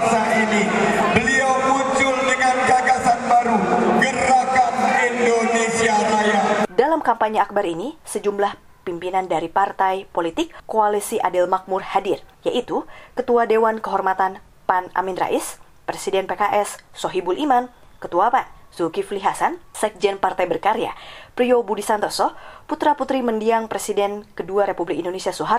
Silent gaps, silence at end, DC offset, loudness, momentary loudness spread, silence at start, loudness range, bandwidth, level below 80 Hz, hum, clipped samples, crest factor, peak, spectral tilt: none; 0 s; under 0.1%; -20 LUFS; 10 LU; 0 s; 5 LU; 15.5 kHz; -52 dBFS; none; under 0.1%; 18 dB; -2 dBFS; -4 dB/octave